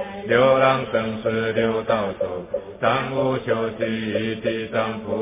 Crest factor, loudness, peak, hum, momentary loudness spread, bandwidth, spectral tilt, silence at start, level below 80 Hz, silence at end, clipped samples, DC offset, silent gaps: 18 dB; -22 LUFS; -4 dBFS; none; 8 LU; 3.8 kHz; -10 dB/octave; 0 s; -52 dBFS; 0 s; under 0.1%; under 0.1%; none